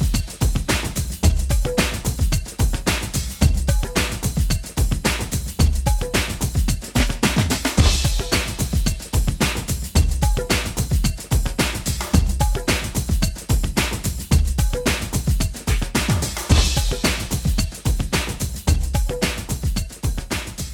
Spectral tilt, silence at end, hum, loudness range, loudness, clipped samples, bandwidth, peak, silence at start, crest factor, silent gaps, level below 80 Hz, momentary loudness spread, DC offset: -4 dB/octave; 0 s; none; 2 LU; -21 LUFS; under 0.1%; 20 kHz; -2 dBFS; 0 s; 18 dB; none; -22 dBFS; 5 LU; under 0.1%